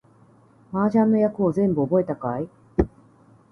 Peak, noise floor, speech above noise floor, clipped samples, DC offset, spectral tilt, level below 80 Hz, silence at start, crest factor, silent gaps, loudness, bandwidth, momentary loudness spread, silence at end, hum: -4 dBFS; -54 dBFS; 33 dB; under 0.1%; under 0.1%; -10.5 dB/octave; -42 dBFS; 0.7 s; 20 dB; none; -23 LUFS; 6.2 kHz; 10 LU; 0.65 s; none